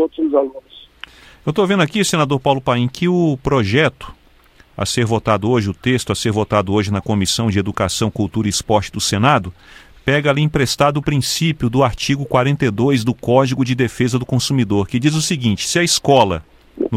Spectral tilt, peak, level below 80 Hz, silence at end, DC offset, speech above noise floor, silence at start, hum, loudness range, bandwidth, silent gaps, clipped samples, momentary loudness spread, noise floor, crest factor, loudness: -5 dB/octave; 0 dBFS; -42 dBFS; 0 s; under 0.1%; 32 dB; 0 s; none; 2 LU; 16 kHz; none; under 0.1%; 5 LU; -49 dBFS; 16 dB; -17 LUFS